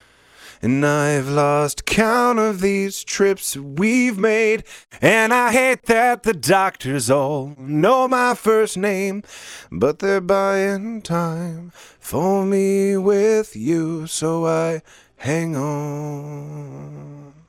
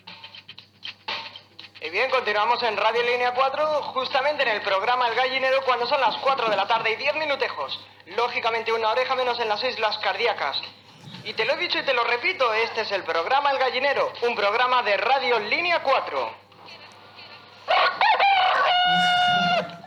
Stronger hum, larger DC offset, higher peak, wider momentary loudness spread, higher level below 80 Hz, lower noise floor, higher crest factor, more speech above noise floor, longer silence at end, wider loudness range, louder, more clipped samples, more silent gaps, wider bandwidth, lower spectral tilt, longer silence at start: neither; neither; first, -2 dBFS vs -8 dBFS; about the same, 14 LU vs 15 LU; first, -50 dBFS vs -76 dBFS; about the same, -47 dBFS vs -46 dBFS; about the same, 18 dB vs 14 dB; first, 28 dB vs 23 dB; first, 0.2 s vs 0 s; about the same, 5 LU vs 3 LU; first, -19 LUFS vs -22 LUFS; neither; neither; first, 16.5 kHz vs 12.5 kHz; first, -5 dB/octave vs -3 dB/octave; first, 0.4 s vs 0.05 s